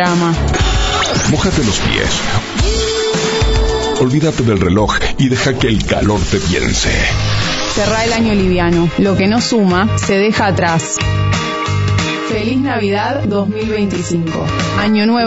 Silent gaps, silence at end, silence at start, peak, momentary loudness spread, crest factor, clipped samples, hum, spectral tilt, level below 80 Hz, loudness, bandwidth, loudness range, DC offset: none; 0 s; 0 s; 0 dBFS; 4 LU; 12 dB; under 0.1%; none; -5 dB/octave; -24 dBFS; -14 LUFS; 8 kHz; 3 LU; under 0.1%